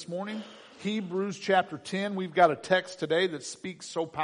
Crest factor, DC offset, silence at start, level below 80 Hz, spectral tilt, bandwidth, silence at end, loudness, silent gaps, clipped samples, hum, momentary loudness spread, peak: 22 dB; under 0.1%; 0 s; -74 dBFS; -4.5 dB/octave; 10.5 kHz; 0 s; -29 LUFS; none; under 0.1%; none; 14 LU; -8 dBFS